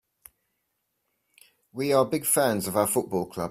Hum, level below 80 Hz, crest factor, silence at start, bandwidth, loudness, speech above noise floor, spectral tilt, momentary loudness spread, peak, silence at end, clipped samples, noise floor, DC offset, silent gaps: none; -64 dBFS; 20 dB; 1.75 s; 16 kHz; -25 LUFS; 53 dB; -4 dB/octave; 9 LU; -8 dBFS; 0 s; under 0.1%; -78 dBFS; under 0.1%; none